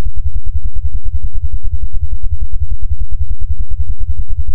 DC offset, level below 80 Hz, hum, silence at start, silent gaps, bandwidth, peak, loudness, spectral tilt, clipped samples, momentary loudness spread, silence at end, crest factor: 50%; -18 dBFS; none; 0 s; none; 0.2 kHz; 0 dBFS; -23 LUFS; -18 dB/octave; under 0.1%; 1 LU; 0 s; 8 dB